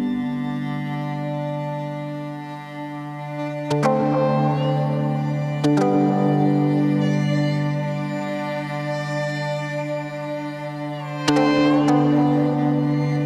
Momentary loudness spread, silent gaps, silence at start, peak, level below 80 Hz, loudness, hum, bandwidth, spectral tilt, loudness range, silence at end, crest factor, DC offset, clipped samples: 12 LU; none; 0 s; -4 dBFS; -58 dBFS; -22 LUFS; none; 10.5 kHz; -7.5 dB/octave; 7 LU; 0 s; 16 dB; under 0.1%; under 0.1%